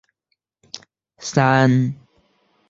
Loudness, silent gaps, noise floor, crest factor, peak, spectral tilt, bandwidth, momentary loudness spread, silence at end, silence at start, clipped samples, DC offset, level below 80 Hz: -18 LUFS; none; -74 dBFS; 20 dB; -2 dBFS; -6 dB/octave; 7.8 kHz; 23 LU; 0.75 s; 0.75 s; under 0.1%; under 0.1%; -58 dBFS